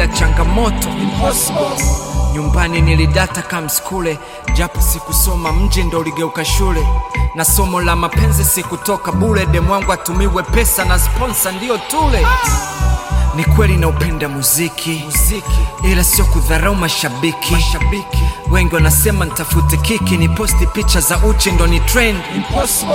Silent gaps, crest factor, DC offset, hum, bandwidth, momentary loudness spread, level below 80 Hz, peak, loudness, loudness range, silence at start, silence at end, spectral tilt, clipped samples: none; 14 dB; under 0.1%; none; 17 kHz; 6 LU; -16 dBFS; 0 dBFS; -14 LUFS; 2 LU; 0 s; 0 s; -4 dB/octave; under 0.1%